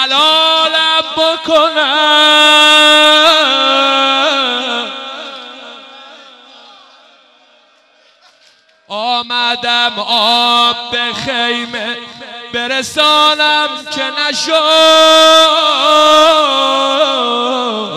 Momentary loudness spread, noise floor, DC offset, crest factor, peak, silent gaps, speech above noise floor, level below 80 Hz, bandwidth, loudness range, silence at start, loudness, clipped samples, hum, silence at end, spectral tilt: 15 LU; -50 dBFS; under 0.1%; 12 dB; 0 dBFS; none; 40 dB; -56 dBFS; 15 kHz; 12 LU; 0 s; -9 LUFS; under 0.1%; none; 0 s; -1 dB/octave